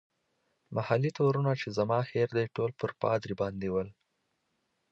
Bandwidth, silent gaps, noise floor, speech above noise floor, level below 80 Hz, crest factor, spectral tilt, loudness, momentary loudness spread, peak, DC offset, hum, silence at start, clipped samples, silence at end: 7.8 kHz; none; -79 dBFS; 49 dB; -64 dBFS; 20 dB; -7.5 dB/octave; -31 LUFS; 7 LU; -12 dBFS; under 0.1%; none; 0.7 s; under 0.1%; 1 s